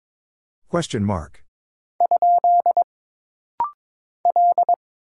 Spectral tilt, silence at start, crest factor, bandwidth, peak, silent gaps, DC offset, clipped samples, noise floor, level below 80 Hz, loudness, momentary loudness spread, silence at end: -6.5 dB/octave; 0.75 s; 14 dB; 11 kHz; -8 dBFS; 1.48-1.99 s, 2.84-3.58 s, 3.74-4.24 s; under 0.1%; under 0.1%; under -90 dBFS; -52 dBFS; -20 LUFS; 12 LU; 0.4 s